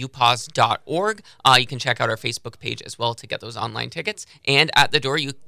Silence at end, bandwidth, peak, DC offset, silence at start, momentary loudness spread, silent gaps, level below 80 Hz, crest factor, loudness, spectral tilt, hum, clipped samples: 0 s; 16 kHz; -2 dBFS; under 0.1%; 0 s; 14 LU; none; -58 dBFS; 20 dB; -21 LUFS; -3 dB/octave; none; under 0.1%